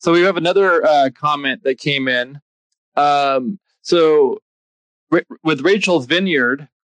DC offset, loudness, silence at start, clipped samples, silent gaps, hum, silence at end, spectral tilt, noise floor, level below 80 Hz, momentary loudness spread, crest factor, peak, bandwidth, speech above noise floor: under 0.1%; -16 LUFS; 0 s; under 0.1%; 2.42-2.70 s, 2.78-2.92 s, 4.42-5.07 s; none; 0.25 s; -5 dB/octave; under -90 dBFS; -70 dBFS; 7 LU; 14 dB; -4 dBFS; 9.8 kHz; over 75 dB